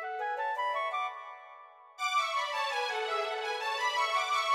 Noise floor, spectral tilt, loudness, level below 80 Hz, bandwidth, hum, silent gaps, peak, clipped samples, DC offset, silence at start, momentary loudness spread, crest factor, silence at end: -53 dBFS; 3 dB/octave; -32 LUFS; -90 dBFS; 16 kHz; none; none; -18 dBFS; under 0.1%; under 0.1%; 0 s; 10 LU; 14 dB; 0 s